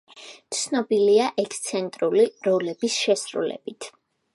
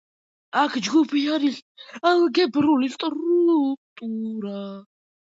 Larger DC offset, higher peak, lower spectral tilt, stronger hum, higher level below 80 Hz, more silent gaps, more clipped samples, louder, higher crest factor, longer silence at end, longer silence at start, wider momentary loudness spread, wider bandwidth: neither; about the same, -8 dBFS vs -6 dBFS; about the same, -3.5 dB/octave vs -4.5 dB/octave; neither; second, -78 dBFS vs -70 dBFS; second, none vs 1.62-1.75 s, 3.77-3.96 s; neither; about the same, -23 LUFS vs -22 LUFS; about the same, 16 dB vs 18 dB; about the same, 0.45 s vs 0.5 s; second, 0.15 s vs 0.55 s; first, 18 LU vs 14 LU; first, 11.5 kHz vs 7.8 kHz